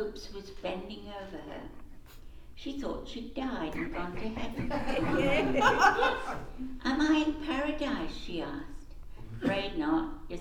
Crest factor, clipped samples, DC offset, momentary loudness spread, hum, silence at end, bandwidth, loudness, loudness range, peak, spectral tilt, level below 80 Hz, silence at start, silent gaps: 22 dB; under 0.1%; under 0.1%; 18 LU; none; 0 s; 16.5 kHz; -31 LUFS; 12 LU; -10 dBFS; -5 dB/octave; -44 dBFS; 0 s; none